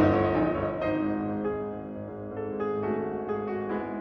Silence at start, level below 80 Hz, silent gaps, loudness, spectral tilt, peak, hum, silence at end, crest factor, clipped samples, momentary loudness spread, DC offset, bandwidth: 0 s; -52 dBFS; none; -30 LUFS; -10 dB/octave; -10 dBFS; none; 0 s; 18 dB; under 0.1%; 11 LU; under 0.1%; 5.8 kHz